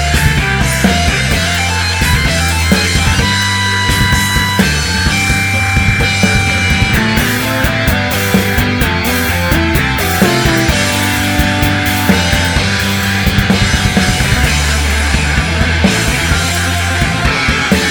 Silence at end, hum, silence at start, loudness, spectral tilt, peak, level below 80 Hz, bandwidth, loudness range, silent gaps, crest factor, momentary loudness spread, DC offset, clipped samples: 0 s; none; 0 s; -11 LUFS; -4 dB/octave; 0 dBFS; -20 dBFS; over 20 kHz; 1 LU; none; 12 dB; 2 LU; under 0.1%; 0.2%